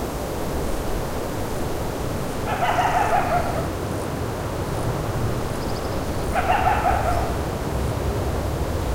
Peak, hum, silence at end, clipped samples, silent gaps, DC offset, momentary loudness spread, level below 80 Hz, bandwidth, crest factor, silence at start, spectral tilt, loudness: -6 dBFS; none; 0 s; under 0.1%; none; under 0.1%; 7 LU; -32 dBFS; 16 kHz; 16 dB; 0 s; -5.5 dB/octave; -24 LUFS